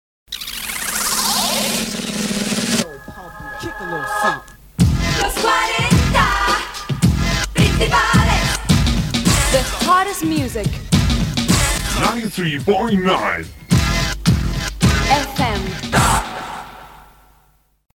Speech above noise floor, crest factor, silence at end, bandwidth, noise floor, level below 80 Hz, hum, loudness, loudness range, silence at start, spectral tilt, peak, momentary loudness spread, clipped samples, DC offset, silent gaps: 38 dB; 18 dB; 0.95 s; 18 kHz; -56 dBFS; -26 dBFS; none; -17 LUFS; 4 LU; 0.3 s; -4 dB/octave; 0 dBFS; 12 LU; under 0.1%; under 0.1%; none